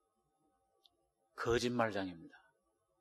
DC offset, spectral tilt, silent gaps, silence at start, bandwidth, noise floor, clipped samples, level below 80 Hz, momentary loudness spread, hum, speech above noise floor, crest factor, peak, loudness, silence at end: under 0.1%; -5 dB/octave; none; 1.35 s; 13 kHz; -81 dBFS; under 0.1%; -64 dBFS; 20 LU; none; 44 dB; 24 dB; -18 dBFS; -37 LUFS; 0.65 s